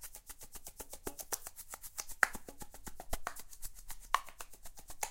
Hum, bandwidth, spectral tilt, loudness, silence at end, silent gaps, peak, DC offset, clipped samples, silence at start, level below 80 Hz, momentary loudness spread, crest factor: none; 17 kHz; -1 dB/octave; -41 LUFS; 0 s; none; -6 dBFS; under 0.1%; under 0.1%; 0 s; -54 dBFS; 18 LU; 36 dB